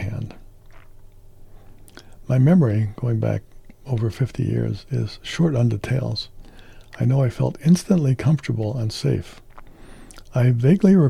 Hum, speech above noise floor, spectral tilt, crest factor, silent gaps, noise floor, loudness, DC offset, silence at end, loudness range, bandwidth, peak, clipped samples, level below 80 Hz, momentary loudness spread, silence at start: none; 24 dB; -7.5 dB/octave; 16 dB; none; -43 dBFS; -21 LUFS; under 0.1%; 0 s; 3 LU; 12.5 kHz; -4 dBFS; under 0.1%; -44 dBFS; 12 LU; 0 s